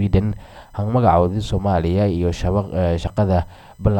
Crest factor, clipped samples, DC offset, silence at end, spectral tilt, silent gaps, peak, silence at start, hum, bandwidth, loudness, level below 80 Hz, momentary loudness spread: 18 dB; under 0.1%; under 0.1%; 0 s; -8.5 dB/octave; none; -2 dBFS; 0 s; none; 17 kHz; -19 LUFS; -32 dBFS; 11 LU